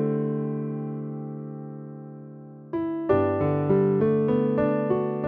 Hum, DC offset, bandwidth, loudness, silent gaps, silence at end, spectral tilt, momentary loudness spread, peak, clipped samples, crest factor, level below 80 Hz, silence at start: none; under 0.1%; 4.1 kHz; -25 LUFS; none; 0 s; -12 dB/octave; 18 LU; -10 dBFS; under 0.1%; 16 dB; -54 dBFS; 0 s